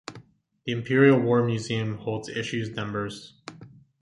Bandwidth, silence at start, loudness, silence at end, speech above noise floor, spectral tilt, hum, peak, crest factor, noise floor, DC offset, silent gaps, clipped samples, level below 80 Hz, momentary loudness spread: 11.5 kHz; 0.1 s; -25 LUFS; 0.35 s; 29 dB; -6.5 dB/octave; none; -6 dBFS; 20 dB; -54 dBFS; under 0.1%; none; under 0.1%; -62 dBFS; 24 LU